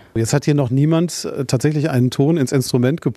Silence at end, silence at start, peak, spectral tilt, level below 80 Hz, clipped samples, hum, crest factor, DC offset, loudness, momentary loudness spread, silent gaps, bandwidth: 0.05 s; 0.15 s; -2 dBFS; -6.5 dB/octave; -52 dBFS; under 0.1%; none; 14 dB; under 0.1%; -17 LUFS; 4 LU; none; 14 kHz